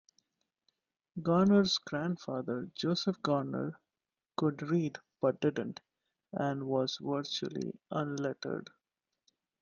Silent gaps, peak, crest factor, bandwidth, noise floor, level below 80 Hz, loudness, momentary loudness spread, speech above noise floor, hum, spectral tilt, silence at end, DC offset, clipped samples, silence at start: none; -16 dBFS; 18 dB; 7.4 kHz; under -90 dBFS; -72 dBFS; -34 LUFS; 12 LU; over 57 dB; none; -6 dB/octave; 1 s; under 0.1%; under 0.1%; 1.15 s